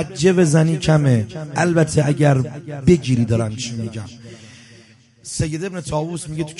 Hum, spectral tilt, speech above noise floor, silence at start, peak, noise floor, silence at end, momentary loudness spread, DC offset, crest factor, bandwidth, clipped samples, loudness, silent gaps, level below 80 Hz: none; -6.5 dB/octave; 30 dB; 0 s; -2 dBFS; -48 dBFS; 0 s; 13 LU; under 0.1%; 16 dB; 11.5 kHz; under 0.1%; -18 LUFS; none; -42 dBFS